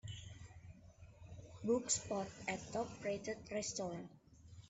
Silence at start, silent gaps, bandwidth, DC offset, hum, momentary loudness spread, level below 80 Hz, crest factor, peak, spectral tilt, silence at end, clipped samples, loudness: 0.05 s; none; 8.2 kHz; under 0.1%; none; 22 LU; -68 dBFS; 22 dB; -22 dBFS; -3.5 dB/octave; 0 s; under 0.1%; -42 LUFS